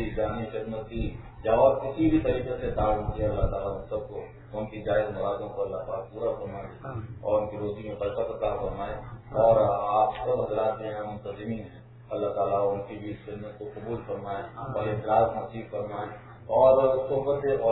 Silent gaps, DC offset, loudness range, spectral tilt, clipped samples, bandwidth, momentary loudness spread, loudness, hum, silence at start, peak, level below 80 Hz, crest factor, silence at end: none; under 0.1%; 6 LU; -11 dB/octave; under 0.1%; 4.1 kHz; 16 LU; -28 LUFS; none; 0 s; -8 dBFS; -44 dBFS; 20 dB; 0 s